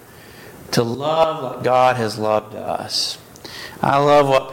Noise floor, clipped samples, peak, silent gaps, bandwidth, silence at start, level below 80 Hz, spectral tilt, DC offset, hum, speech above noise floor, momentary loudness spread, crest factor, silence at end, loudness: -41 dBFS; under 0.1%; -2 dBFS; none; 17 kHz; 0.25 s; -54 dBFS; -4.5 dB/octave; under 0.1%; none; 23 dB; 19 LU; 18 dB; 0 s; -18 LUFS